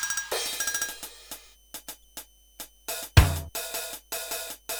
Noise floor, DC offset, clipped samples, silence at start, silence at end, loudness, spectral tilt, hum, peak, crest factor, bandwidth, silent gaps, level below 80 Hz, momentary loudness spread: -47 dBFS; under 0.1%; under 0.1%; 0 s; 0 s; -28 LUFS; -3 dB/octave; none; -2 dBFS; 28 dB; over 20 kHz; none; -36 dBFS; 22 LU